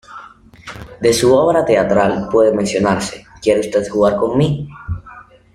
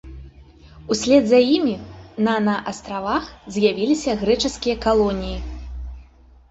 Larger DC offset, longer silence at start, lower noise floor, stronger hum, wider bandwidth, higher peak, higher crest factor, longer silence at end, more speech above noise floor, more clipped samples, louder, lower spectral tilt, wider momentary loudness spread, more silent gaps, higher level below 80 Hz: neither; about the same, 0.1 s vs 0.05 s; second, -40 dBFS vs -48 dBFS; neither; first, 15 kHz vs 8.2 kHz; about the same, -2 dBFS vs -2 dBFS; about the same, 14 dB vs 18 dB; about the same, 0.35 s vs 0.45 s; about the same, 26 dB vs 29 dB; neither; first, -15 LUFS vs -20 LUFS; about the same, -5.5 dB/octave vs -5 dB/octave; about the same, 18 LU vs 19 LU; neither; about the same, -42 dBFS vs -38 dBFS